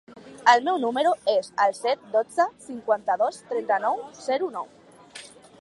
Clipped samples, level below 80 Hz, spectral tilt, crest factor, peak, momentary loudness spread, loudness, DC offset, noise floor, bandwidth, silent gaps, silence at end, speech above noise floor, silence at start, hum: under 0.1%; -74 dBFS; -3 dB/octave; 22 dB; -4 dBFS; 17 LU; -24 LUFS; under 0.1%; -46 dBFS; 11.5 kHz; none; 0.35 s; 22 dB; 0.1 s; none